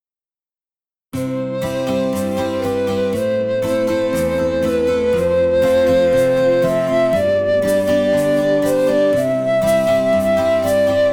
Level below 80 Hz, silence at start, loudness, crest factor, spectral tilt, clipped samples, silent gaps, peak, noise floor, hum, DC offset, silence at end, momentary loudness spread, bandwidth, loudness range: -48 dBFS; 1.15 s; -16 LUFS; 12 dB; -6 dB/octave; under 0.1%; none; -4 dBFS; under -90 dBFS; none; under 0.1%; 0 s; 6 LU; 18.5 kHz; 5 LU